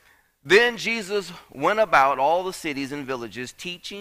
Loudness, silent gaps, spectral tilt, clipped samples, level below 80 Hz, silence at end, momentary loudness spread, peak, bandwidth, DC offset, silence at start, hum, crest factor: -22 LUFS; none; -3.5 dB/octave; under 0.1%; -60 dBFS; 0 s; 15 LU; -6 dBFS; 15.5 kHz; under 0.1%; 0.45 s; none; 18 dB